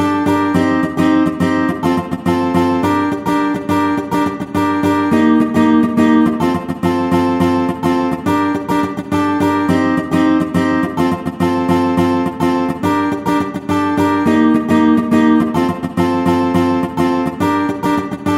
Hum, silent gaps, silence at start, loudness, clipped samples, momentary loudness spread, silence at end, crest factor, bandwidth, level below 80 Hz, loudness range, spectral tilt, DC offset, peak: none; none; 0 s; -15 LUFS; under 0.1%; 5 LU; 0 s; 14 dB; 15.5 kHz; -46 dBFS; 2 LU; -7 dB/octave; under 0.1%; 0 dBFS